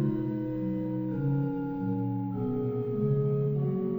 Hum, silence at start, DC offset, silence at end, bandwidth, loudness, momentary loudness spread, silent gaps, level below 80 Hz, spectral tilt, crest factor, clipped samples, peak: none; 0 s; under 0.1%; 0 s; 3.3 kHz; -30 LUFS; 4 LU; none; -56 dBFS; -12.5 dB/octave; 12 dB; under 0.1%; -16 dBFS